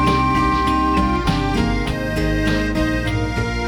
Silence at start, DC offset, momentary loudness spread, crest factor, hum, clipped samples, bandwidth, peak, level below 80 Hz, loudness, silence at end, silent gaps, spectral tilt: 0 s; under 0.1%; 4 LU; 14 dB; none; under 0.1%; 18 kHz; -4 dBFS; -26 dBFS; -19 LUFS; 0 s; none; -6 dB/octave